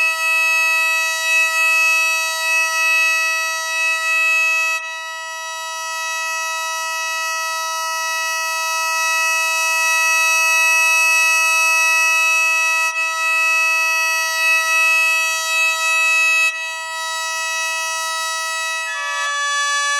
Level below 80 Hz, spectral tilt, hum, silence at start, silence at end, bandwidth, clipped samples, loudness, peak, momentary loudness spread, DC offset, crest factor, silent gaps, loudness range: -86 dBFS; 7.5 dB/octave; none; 0 s; 0 s; over 20 kHz; under 0.1%; -15 LUFS; -6 dBFS; 9 LU; under 0.1%; 12 dB; none; 7 LU